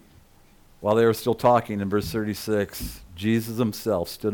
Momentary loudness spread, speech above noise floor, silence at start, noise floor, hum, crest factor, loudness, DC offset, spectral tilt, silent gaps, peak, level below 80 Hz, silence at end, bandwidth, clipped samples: 10 LU; 31 dB; 0.8 s; -54 dBFS; none; 18 dB; -24 LUFS; under 0.1%; -6 dB/octave; none; -8 dBFS; -48 dBFS; 0 s; 19 kHz; under 0.1%